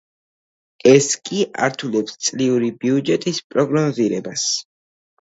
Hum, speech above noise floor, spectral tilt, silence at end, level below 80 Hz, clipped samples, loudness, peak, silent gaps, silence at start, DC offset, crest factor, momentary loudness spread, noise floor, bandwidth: none; over 72 dB; -4 dB/octave; 0.6 s; -64 dBFS; under 0.1%; -19 LUFS; 0 dBFS; 3.44-3.50 s; 0.85 s; under 0.1%; 20 dB; 9 LU; under -90 dBFS; 8 kHz